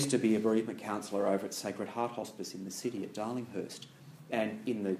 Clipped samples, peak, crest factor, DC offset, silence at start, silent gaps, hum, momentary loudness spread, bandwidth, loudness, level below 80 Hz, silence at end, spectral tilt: under 0.1%; -16 dBFS; 18 dB; under 0.1%; 0 s; none; none; 13 LU; 15.5 kHz; -35 LUFS; -80 dBFS; 0 s; -5 dB/octave